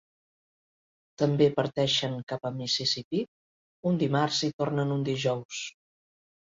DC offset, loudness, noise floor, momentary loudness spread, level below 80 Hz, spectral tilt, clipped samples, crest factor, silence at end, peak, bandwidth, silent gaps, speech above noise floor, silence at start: under 0.1%; -28 LUFS; under -90 dBFS; 10 LU; -68 dBFS; -5 dB/octave; under 0.1%; 20 dB; 0.75 s; -10 dBFS; 7.8 kHz; 2.23-2.27 s, 3.04-3.11 s, 3.28-3.83 s, 4.53-4.59 s, 5.45-5.49 s; over 62 dB; 1.2 s